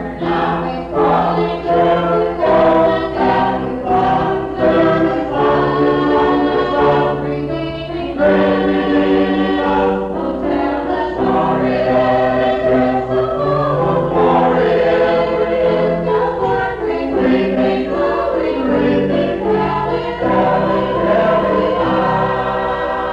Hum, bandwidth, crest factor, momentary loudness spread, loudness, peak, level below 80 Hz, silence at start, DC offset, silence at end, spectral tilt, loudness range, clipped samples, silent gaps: none; 7.8 kHz; 10 dB; 5 LU; -15 LUFS; -4 dBFS; -36 dBFS; 0 s; under 0.1%; 0 s; -8 dB/octave; 2 LU; under 0.1%; none